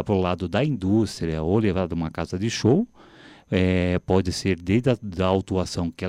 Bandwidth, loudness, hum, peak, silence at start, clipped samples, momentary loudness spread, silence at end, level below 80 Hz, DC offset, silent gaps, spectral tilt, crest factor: 12.5 kHz; -24 LUFS; none; -6 dBFS; 0 s; under 0.1%; 6 LU; 0 s; -44 dBFS; under 0.1%; none; -6.5 dB/octave; 16 dB